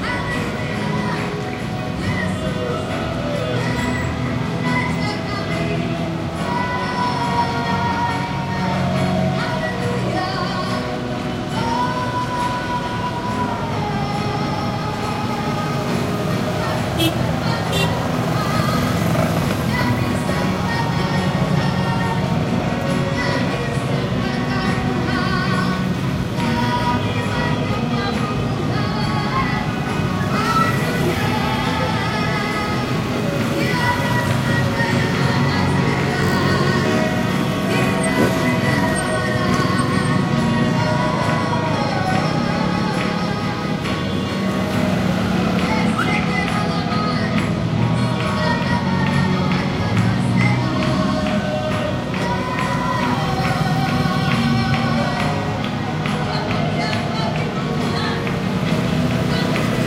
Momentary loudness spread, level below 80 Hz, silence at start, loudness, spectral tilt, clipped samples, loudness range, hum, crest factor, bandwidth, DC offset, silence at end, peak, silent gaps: 4 LU; -38 dBFS; 0 s; -20 LUFS; -6 dB/octave; under 0.1%; 4 LU; none; 16 dB; 16 kHz; under 0.1%; 0 s; -4 dBFS; none